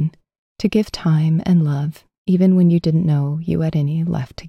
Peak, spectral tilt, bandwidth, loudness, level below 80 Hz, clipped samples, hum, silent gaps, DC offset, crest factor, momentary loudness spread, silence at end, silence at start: -4 dBFS; -8.5 dB/octave; 8.6 kHz; -18 LUFS; -46 dBFS; under 0.1%; none; 0.39-0.55 s, 2.18-2.25 s; under 0.1%; 12 dB; 9 LU; 0 s; 0 s